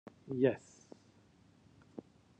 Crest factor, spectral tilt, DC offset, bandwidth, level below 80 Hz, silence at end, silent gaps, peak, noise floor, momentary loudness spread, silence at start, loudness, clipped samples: 24 dB; -7.5 dB/octave; under 0.1%; 8.6 kHz; -78 dBFS; 0.4 s; none; -16 dBFS; -66 dBFS; 26 LU; 0.25 s; -35 LUFS; under 0.1%